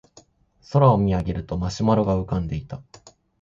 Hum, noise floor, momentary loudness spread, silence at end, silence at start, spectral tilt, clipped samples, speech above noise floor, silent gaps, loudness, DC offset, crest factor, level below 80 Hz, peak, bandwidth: none; -55 dBFS; 14 LU; 0.6 s; 0.7 s; -8 dB/octave; under 0.1%; 33 dB; none; -22 LUFS; under 0.1%; 18 dB; -40 dBFS; -4 dBFS; 7.6 kHz